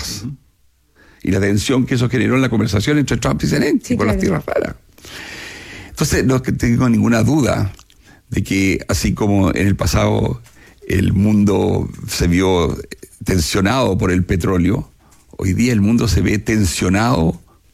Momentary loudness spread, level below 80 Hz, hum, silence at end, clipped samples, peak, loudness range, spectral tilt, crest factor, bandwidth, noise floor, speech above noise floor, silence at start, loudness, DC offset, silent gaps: 13 LU; -34 dBFS; none; 0.35 s; under 0.1%; -4 dBFS; 2 LU; -6 dB/octave; 12 dB; 16 kHz; -56 dBFS; 40 dB; 0 s; -16 LUFS; under 0.1%; none